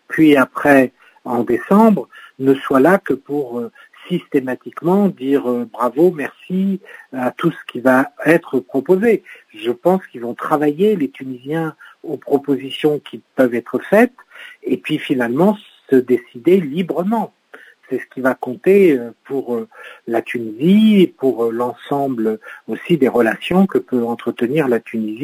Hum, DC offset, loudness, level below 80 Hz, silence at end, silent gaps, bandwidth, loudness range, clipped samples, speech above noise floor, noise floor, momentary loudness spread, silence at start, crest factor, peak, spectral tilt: none; under 0.1%; -17 LUFS; -62 dBFS; 0 s; none; 16 kHz; 3 LU; under 0.1%; 28 dB; -44 dBFS; 14 LU; 0.1 s; 16 dB; 0 dBFS; -7.5 dB/octave